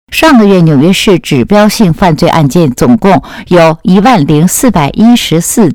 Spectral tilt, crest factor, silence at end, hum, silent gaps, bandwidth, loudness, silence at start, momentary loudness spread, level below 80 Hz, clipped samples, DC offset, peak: -5.5 dB/octave; 6 dB; 0 s; none; none; 18.5 kHz; -6 LUFS; 0.1 s; 4 LU; -30 dBFS; 6%; 0.9%; 0 dBFS